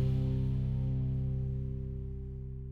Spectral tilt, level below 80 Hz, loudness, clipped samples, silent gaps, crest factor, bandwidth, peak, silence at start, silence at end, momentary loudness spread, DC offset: -11 dB/octave; -40 dBFS; -35 LUFS; under 0.1%; none; 10 dB; 4.3 kHz; -22 dBFS; 0 s; 0 s; 10 LU; under 0.1%